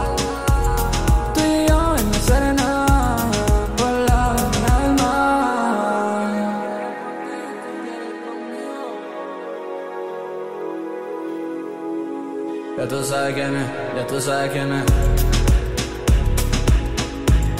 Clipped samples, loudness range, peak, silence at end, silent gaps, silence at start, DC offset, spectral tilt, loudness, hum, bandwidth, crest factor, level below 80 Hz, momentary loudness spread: under 0.1%; 11 LU; -4 dBFS; 0 s; none; 0 s; under 0.1%; -5.5 dB/octave; -21 LUFS; none; 16 kHz; 14 dB; -24 dBFS; 12 LU